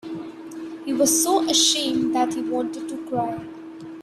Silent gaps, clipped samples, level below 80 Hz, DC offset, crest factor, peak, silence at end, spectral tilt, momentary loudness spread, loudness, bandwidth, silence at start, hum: none; under 0.1%; -62 dBFS; under 0.1%; 18 dB; -6 dBFS; 0 s; -2 dB/octave; 19 LU; -21 LUFS; 16 kHz; 0.05 s; none